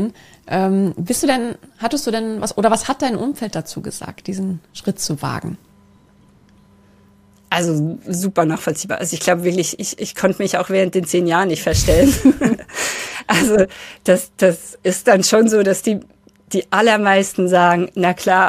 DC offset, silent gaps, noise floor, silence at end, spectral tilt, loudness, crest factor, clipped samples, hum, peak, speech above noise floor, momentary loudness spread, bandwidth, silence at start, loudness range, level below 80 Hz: under 0.1%; none; -51 dBFS; 0 s; -4.5 dB/octave; -17 LUFS; 16 dB; under 0.1%; none; 0 dBFS; 34 dB; 12 LU; 15.5 kHz; 0 s; 10 LU; -38 dBFS